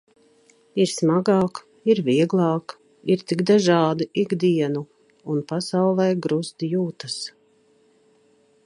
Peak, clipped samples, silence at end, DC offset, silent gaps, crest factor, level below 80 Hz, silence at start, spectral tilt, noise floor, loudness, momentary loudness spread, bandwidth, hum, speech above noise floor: -4 dBFS; under 0.1%; 1.35 s; under 0.1%; none; 18 dB; -66 dBFS; 0.75 s; -6 dB/octave; -60 dBFS; -22 LUFS; 12 LU; 11.5 kHz; none; 39 dB